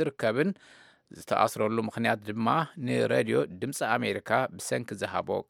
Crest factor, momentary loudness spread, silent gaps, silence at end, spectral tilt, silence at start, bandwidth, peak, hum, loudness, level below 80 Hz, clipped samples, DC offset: 20 dB; 6 LU; none; 0.05 s; -5 dB/octave; 0 s; 17.5 kHz; -10 dBFS; none; -29 LUFS; -72 dBFS; under 0.1%; under 0.1%